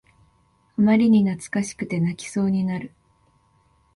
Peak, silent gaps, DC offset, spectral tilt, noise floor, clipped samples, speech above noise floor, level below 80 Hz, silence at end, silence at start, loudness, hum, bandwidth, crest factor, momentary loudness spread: -6 dBFS; none; under 0.1%; -6.5 dB/octave; -62 dBFS; under 0.1%; 41 dB; -58 dBFS; 1.1 s; 0.8 s; -22 LUFS; none; 11.5 kHz; 16 dB; 13 LU